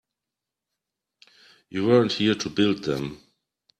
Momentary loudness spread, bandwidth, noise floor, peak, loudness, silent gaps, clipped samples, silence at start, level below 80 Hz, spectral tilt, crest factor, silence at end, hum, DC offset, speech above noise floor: 12 LU; 13 kHz; -87 dBFS; -6 dBFS; -23 LUFS; none; under 0.1%; 1.7 s; -62 dBFS; -5.5 dB/octave; 20 dB; 0.65 s; none; under 0.1%; 64 dB